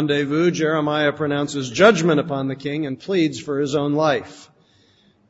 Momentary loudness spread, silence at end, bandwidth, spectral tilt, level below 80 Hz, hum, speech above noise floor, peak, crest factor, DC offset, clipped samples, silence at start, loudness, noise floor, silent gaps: 10 LU; 0.85 s; 8 kHz; -5.5 dB/octave; -62 dBFS; none; 37 dB; -2 dBFS; 18 dB; under 0.1%; under 0.1%; 0 s; -20 LUFS; -57 dBFS; none